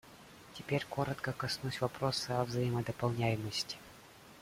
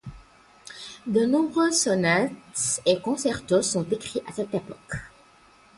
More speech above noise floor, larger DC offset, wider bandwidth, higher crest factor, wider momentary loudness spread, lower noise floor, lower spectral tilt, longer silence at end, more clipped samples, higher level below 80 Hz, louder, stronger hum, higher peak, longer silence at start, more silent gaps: second, 21 dB vs 31 dB; neither; first, 16 kHz vs 11.5 kHz; about the same, 20 dB vs 18 dB; first, 21 LU vs 15 LU; about the same, -56 dBFS vs -55 dBFS; first, -5 dB/octave vs -3.5 dB/octave; second, 0 s vs 0.7 s; neither; second, -64 dBFS vs -56 dBFS; second, -36 LUFS vs -24 LUFS; neither; second, -18 dBFS vs -8 dBFS; about the same, 0.05 s vs 0.05 s; neither